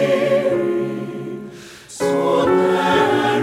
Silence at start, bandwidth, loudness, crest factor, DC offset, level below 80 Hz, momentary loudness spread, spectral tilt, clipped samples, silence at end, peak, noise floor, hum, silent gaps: 0 s; 15.5 kHz; -18 LUFS; 14 dB; under 0.1%; -54 dBFS; 17 LU; -5.5 dB/octave; under 0.1%; 0 s; -4 dBFS; -37 dBFS; none; none